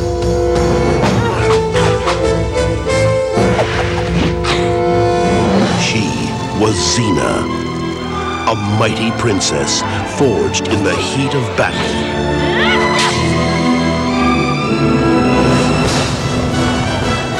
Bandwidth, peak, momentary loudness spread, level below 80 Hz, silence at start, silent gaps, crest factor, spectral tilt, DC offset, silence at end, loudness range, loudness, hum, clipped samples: 12.5 kHz; -2 dBFS; 4 LU; -28 dBFS; 0 s; none; 10 dB; -5 dB/octave; under 0.1%; 0 s; 2 LU; -14 LUFS; none; under 0.1%